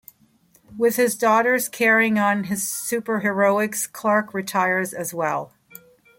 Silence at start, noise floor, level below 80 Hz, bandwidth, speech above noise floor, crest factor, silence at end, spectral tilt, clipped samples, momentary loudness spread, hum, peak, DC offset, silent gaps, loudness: 0.7 s; -59 dBFS; -68 dBFS; 17 kHz; 38 dB; 16 dB; 0.75 s; -4 dB/octave; under 0.1%; 8 LU; none; -6 dBFS; under 0.1%; none; -21 LUFS